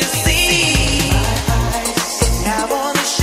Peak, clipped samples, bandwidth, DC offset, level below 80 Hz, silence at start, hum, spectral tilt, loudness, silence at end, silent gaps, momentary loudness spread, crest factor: -2 dBFS; under 0.1%; 16.5 kHz; under 0.1%; -22 dBFS; 0 s; none; -3 dB/octave; -15 LUFS; 0 s; none; 6 LU; 14 dB